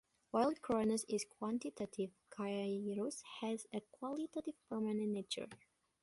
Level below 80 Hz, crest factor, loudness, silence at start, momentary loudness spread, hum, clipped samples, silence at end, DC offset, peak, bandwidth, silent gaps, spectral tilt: -78 dBFS; 18 dB; -41 LUFS; 0.35 s; 9 LU; none; under 0.1%; 0.45 s; under 0.1%; -22 dBFS; 11.5 kHz; none; -5 dB/octave